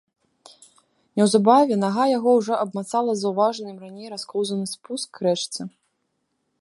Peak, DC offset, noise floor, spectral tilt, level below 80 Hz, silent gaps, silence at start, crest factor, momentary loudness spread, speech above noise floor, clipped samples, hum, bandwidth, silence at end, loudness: -2 dBFS; under 0.1%; -74 dBFS; -5 dB/octave; -74 dBFS; none; 1.15 s; 20 dB; 17 LU; 52 dB; under 0.1%; none; 11.5 kHz; 0.95 s; -22 LUFS